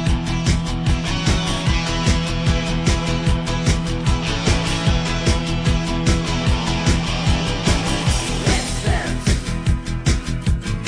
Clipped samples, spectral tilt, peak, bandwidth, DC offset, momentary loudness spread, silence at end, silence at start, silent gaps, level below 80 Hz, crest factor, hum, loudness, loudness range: under 0.1%; -5 dB/octave; -4 dBFS; 10.5 kHz; under 0.1%; 2 LU; 0 s; 0 s; none; -24 dBFS; 14 dB; none; -20 LUFS; 1 LU